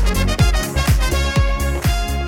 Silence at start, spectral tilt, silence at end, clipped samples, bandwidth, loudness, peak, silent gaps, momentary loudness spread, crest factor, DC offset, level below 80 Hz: 0 s; -5 dB/octave; 0 s; under 0.1%; 18 kHz; -18 LUFS; -4 dBFS; none; 3 LU; 12 dB; under 0.1%; -18 dBFS